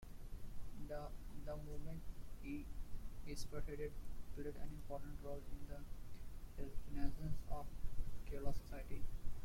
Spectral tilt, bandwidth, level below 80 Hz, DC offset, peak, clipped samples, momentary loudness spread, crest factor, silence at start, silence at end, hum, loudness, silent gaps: -6.5 dB/octave; 15.5 kHz; -48 dBFS; under 0.1%; -24 dBFS; under 0.1%; 8 LU; 18 dB; 0 s; 0 s; none; -52 LUFS; none